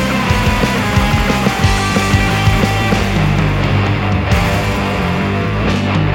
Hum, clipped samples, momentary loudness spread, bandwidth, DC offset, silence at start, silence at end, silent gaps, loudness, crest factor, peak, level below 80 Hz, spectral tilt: none; under 0.1%; 3 LU; 17 kHz; under 0.1%; 0 s; 0 s; none; -14 LUFS; 14 dB; 0 dBFS; -22 dBFS; -5.5 dB/octave